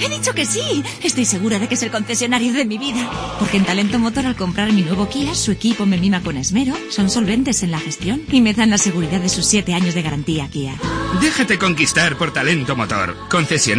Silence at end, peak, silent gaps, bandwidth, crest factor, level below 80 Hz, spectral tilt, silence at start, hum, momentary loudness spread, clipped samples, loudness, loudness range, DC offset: 0 s; -2 dBFS; none; 10.5 kHz; 16 dB; -40 dBFS; -3.5 dB/octave; 0 s; none; 7 LU; under 0.1%; -17 LUFS; 2 LU; under 0.1%